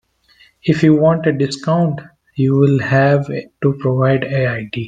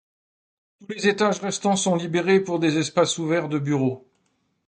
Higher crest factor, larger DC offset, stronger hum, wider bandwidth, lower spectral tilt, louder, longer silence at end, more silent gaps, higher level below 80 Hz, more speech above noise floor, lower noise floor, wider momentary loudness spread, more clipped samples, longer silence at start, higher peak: about the same, 14 dB vs 18 dB; neither; neither; about the same, 9.2 kHz vs 9.4 kHz; first, -8 dB/octave vs -4.5 dB/octave; first, -15 LUFS vs -22 LUFS; second, 0 s vs 0.7 s; neither; first, -54 dBFS vs -68 dBFS; second, 37 dB vs 48 dB; second, -52 dBFS vs -70 dBFS; first, 7 LU vs 4 LU; neither; second, 0.65 s vs 0.8 s; first, 0 dBFS vs -6 dBFS